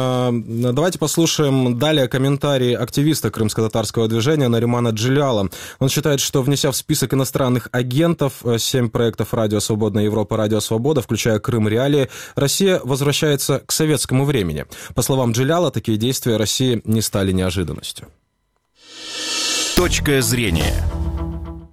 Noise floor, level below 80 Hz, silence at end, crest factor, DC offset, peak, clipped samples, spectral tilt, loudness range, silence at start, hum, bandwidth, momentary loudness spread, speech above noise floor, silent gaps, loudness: -68 dBFS; -36 dBFS; 0.05 s; 18 dB; 0.3%; 0 dBFS; under 0.1%; -5 dB/octave; 3 LU; 0 s; none; 16.5 kHz; 6 LU; 50 dB; none; -18 LUFS